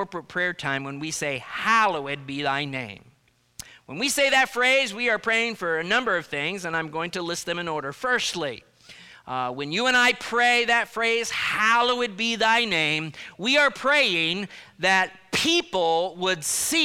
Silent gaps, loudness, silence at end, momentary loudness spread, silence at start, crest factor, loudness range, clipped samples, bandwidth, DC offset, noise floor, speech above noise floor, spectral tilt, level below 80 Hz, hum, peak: none; -23 LUFS; 0 s; 11 LU; 0 s; 16 dB; 5 LU; under 0.1%; 16.5 kHz; under 0.1%; -48 dBFS; 24 dB; -2 dB/octave; -62 dBFS; none; -8 dBFS